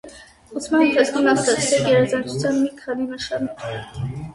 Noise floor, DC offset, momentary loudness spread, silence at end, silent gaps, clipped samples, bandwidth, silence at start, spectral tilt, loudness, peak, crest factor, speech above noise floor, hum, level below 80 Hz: -43 dBFS; under 0.1%; 13 LU; 0 s; none; under 0.1%; 11.5 kHz; 0.05 s; -4.5 dB/octave; -20 LUFS; -2 dBFS; 18 dB; 23 dB; none; -52 dBFS